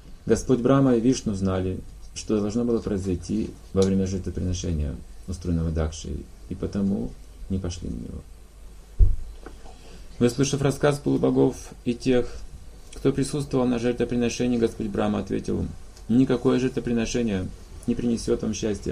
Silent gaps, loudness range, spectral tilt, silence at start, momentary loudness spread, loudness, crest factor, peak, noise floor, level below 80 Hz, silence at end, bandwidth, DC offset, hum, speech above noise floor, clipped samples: none; 6 LU; -6.5 dB/octave; 0.05 s; 15 LU; -25 LUFS; 20 dB; -4 dBFS; -44 dBFS; -34 dBFS; 0 s; 14.5 kHz; under 0.1%; none; 20 dB; under 0.1%